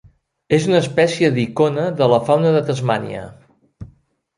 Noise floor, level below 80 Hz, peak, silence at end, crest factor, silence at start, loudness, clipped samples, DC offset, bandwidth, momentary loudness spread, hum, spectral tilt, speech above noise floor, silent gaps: -53 dBFS; -54 dBFS; -2 dBFS; 0.5 s; 16 dB; 0.5 s; -17 LUFS; under 0.1%; under 0.1%; 11.5 kHz; 8 LU; none; -6.5 dB/octave; 37 dB; none